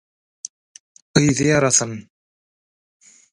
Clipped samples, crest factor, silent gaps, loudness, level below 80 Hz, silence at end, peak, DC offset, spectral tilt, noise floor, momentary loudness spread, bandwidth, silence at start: under 0.1%; 22 dB; none; -17 LUFS; -52 dBFS; 1.3 s; 0 dBFS; under 0.1%; -4 dB/octave; under -90 dBFS; 21 LU; 11.5 kHz; 1.15 s